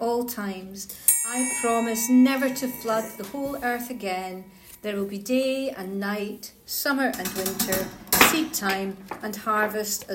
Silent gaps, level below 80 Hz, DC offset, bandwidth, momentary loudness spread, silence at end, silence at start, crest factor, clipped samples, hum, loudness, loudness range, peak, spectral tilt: none; -58 dBFS; under 0.1%; 17 kHz; 15 LU; 0 s; 0 s; 24 dB; under 0.1%; none; -24 LUFS; 6 LU; 0 dBFS; -2.5 dB/octave